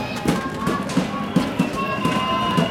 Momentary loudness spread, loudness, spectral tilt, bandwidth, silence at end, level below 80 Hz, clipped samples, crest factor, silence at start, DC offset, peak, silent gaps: 3 LU; -22 LUFS; -5.5 dB/octave; 17 kHz; 0 s; -46 dBFS; under 0.1%; 16 dB; 0 s; under 0.1%; -6 dBFS; none